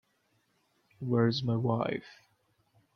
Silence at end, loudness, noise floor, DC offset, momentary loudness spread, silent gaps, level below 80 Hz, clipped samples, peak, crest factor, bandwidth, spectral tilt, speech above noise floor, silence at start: 0.85 s; -31 LUFS; -74 dBFS; under 0.1%; 11 LU; none; -70 dBFS; under 0.1%; -14 dBFS; 20 dB; 6.4 kHz; -8 dB/octave; 44 dB; 1 s